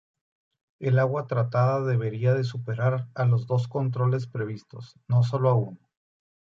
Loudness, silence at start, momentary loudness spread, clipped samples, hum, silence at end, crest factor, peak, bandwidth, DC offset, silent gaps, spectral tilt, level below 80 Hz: -26 LUFS; 0.8 s; 10 LU; under 0.1%; none; 0.8 s; 16 dB; -10 dBFS; 7 kHz; under 0.1%; none; -9 dB/octave; -64 dBFS